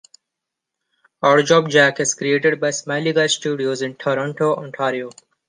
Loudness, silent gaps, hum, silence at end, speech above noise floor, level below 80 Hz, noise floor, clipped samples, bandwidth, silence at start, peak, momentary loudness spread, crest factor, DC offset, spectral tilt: -18 LUFS; none; none; 0.35 s; 64 dB; -68 dBFS; -82 dBFS; under 0.1%; 10 kHz; 1.2 s; -2 dBFS; 9 LU; 18 dB; under 0.1%; -3.5 dB/octave